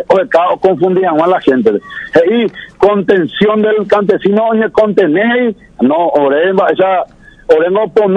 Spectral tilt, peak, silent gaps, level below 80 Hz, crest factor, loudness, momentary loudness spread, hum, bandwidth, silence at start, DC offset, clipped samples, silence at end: -7.5 dB/octave; 0 dBFS; none; -48 dBFS; 10 dB; -11 LUFS; 4 LU; none; 7.8 kHz; 0 s; under 0.1%; 0.8%; 0 s